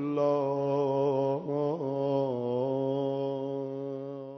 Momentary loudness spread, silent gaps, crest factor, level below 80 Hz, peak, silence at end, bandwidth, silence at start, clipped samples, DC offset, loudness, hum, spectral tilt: 8 LU; none; 14 dB; -78 dBFS; -16 dBFS; 0 s; 6.2 kHz; 0 s; under 0.1%; under 0.1%; -30 LUFS; none; -9 dB/octave